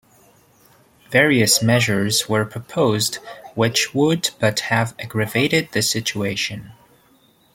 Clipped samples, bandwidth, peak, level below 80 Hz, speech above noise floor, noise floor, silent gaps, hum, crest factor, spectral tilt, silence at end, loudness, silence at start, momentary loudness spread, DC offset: under 0.1%; 16.5 kHz; 0 dBFS; -56 dBFS; 37 dB; -56 dBFS; none; none; 20 dB; -3.5 dB/octave; 0.85 s; -19 LUFS; 1.1 s; 10 LU; under 0.1%